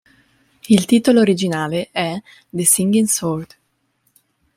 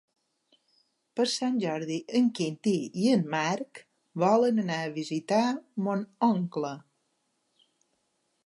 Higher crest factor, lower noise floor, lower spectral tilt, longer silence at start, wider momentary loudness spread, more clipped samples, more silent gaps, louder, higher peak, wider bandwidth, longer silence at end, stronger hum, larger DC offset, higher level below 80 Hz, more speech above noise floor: about the same, 18 dB vs 18 dB; second, -66 dBFS vs -76 dBFS; second, -4 dB/octave vs -5.5 dB/octave; second, 0.7 s vs 1.15 s; about the same, 12 LU vs 10 LU; neither; neither; first, -16 LUFS vs -28 LUFS; first, 0 dBFS vs -12 dBFS; first, 16.5 kHz vs 11.5 kHz; second, 1.1 s vs 1.65 s; neither; neither; first, -58 dBFS vs -82 dBFS; about the same, 49 dB vs 48 dB